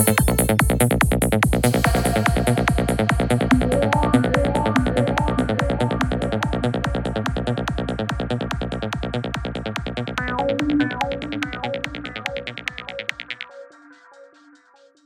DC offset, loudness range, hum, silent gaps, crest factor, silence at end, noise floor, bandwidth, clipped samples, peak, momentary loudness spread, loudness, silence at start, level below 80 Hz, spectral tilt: under 0.1%; 8 LU; none; none; 18 dB; 0.8 s; -54 dBFS; 19 kHz; under 0.1%; -2 dBFS; 10 LU; -21 LUFS; 0 s; -30 dBFS; -5.5 dB/octave